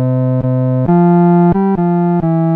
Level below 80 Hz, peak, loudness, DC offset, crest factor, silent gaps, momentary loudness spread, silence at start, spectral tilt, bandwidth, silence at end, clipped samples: -40 dBFS; -2 dBFS; -12 LUFS; under 0.1%; 8 dB; none; 5 LU; 0 s; -13 dB/octave; 2.9 kHz; 0 s; under 0.1%